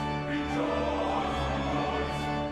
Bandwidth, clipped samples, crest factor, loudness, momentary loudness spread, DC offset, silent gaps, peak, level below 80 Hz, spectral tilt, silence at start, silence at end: 12.5 kHz; under 0.1%; 12 dB; -30 LUFS; 2 LU; under 0.1%; none; -18 dBFS; -42 dBFS; -6 dB/octave; 0 s; 0 s